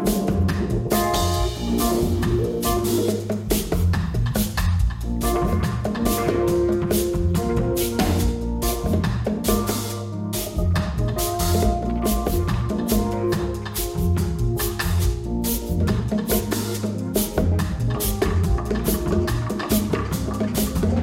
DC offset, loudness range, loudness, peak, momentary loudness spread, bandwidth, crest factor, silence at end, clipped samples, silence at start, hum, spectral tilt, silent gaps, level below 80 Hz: under 0.1%; 2 LU; -23 LUFS; -6 dBFS; 4 LU; 16.5 kHz; 16 dB; 0 s; under 0.1%; 0 s; none; -5.5 dB/octave; none; -28 dBFS